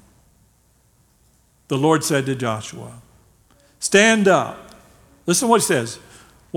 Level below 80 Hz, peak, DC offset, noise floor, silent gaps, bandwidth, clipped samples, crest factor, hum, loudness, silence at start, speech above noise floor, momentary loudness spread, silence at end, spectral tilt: -58 dBFS; 0 dBFS; under 0.1%; -59 dBFS; none; 18 kHz; under 0.1%; 22 dB; none; -18 LUFS; 1.7 s; 40 dB; 22 LU; 0 s; -4 dB/octave